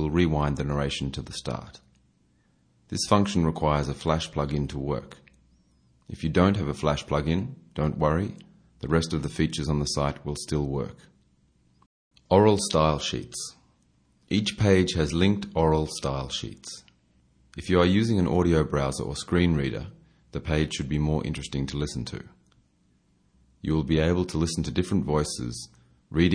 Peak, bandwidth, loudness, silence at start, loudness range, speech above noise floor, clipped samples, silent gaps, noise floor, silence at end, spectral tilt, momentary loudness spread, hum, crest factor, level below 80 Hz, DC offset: -4 dBFS; 10.5 kHz; -26 LUFS; 0 s; 4 LU; 40 dB; under 0.1%; 11.86-12.11 s; -65 dBFS; 0 s; -6 dB/octave; 14 LU; none; 22 dB; -42 dBFS; under 0.1%